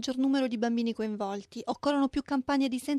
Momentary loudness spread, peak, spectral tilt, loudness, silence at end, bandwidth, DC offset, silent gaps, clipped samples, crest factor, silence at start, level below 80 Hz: 8 LU; -16 dBFS; -4.5 dB/octave; -30 LUFS; 0 s; 13 kHz; under 0.1%; none; under 0.1%; 14 dB; 0 s; -60 dBFS